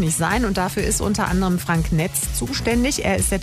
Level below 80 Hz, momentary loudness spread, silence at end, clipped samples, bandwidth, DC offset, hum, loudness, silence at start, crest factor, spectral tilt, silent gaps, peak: -30 dBFS; 2 LU; 0 s; under 0.1%; 16 kHz; under 0.1%; none; -20 LUFS; 0 s; 14 dB; -4.5 dB/octave; none; -6 dBFS